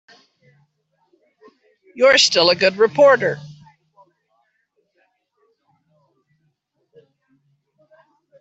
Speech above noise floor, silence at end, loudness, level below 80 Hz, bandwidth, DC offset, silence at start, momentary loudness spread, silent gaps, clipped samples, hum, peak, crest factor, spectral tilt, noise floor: 55 dB; 4.95 s; -14 LUFS; -66 dBFS; 8.2 kHz; under 0.1%; 1.95 s; 8 LU; none; under 0.1%; none; -2 dBFS; 20 dB; -2 dB/octave; -69 dBFS